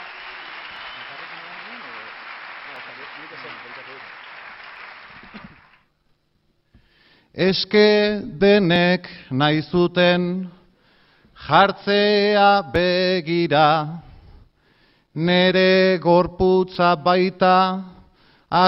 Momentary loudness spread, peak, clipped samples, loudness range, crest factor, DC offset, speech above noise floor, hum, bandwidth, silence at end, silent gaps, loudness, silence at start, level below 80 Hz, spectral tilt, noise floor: 22 LU; -2 dBFS; under 0.1%; 18 LU; 20 dB; under 0.1%; 48 dB; none; 6 kHz; 0 s; none; -18 LUFS; 0 s; -50 dBFS; -8 dB/octave; -65 dBFS